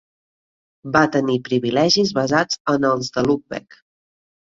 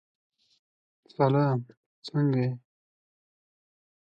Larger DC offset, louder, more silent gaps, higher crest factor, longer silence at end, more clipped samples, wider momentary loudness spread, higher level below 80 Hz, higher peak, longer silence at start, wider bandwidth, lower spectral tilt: neither; first, -19 LUFS vs -27 LUFS; second, 2.60-2.65 s vs 1.77-2.02 s; about the same, 18 dB vs 20 dB; second, 1 s vs 1.45 s; neither; second, 8 LU vs 20 LU; first, -56 dBFS vs -74 dBFS; first, -2 dBFS vs -10 dBFS; second, 0.85 s vs 1.2 s; first, 7.8 kHz vs 6.8 kHz; second, -4.5 dB/octave vs -9 dB/octave